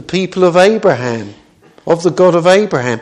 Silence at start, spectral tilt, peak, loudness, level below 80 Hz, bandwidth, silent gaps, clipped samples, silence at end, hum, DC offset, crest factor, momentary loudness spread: 0.1 s; -5.5 dB/octave; 0 dBFS; -11 LUFS; -52 dBFS; 11 kHz; none; 0.3%; 0 s; none; under 0.1%; 12 dB; 13 LU